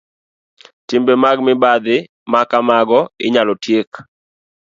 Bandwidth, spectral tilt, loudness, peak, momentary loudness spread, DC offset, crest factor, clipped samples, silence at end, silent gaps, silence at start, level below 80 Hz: 7.6 kHz; -5.5 dB/octave; -14 LUFS; 0 dBFS; 6 LU; under 0.1%; 16 dB; under 0.1%; 0.65 s; 2.09-2.26 s, 3.87-3.92 s; 0.9 s; -62 dBFS